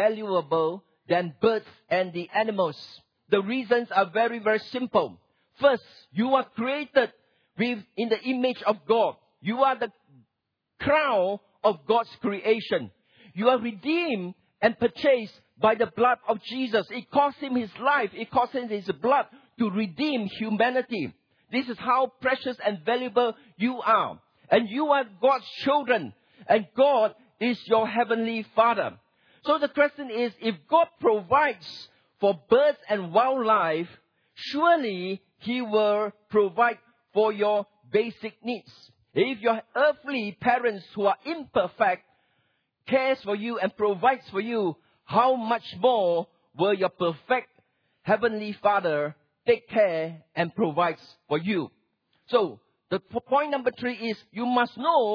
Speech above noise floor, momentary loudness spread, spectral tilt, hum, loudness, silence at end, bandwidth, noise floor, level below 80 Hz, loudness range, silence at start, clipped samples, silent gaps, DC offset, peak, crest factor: 56 dB; 9 LU; -7 dB/octave; none; -26 LUFS; 0 s; 5.4 kHz; -81 dBFS; -70 dBFS; 3 LU; 0 s; under 0.1%; none; under 0.1%; -8 dBFS; 18 dB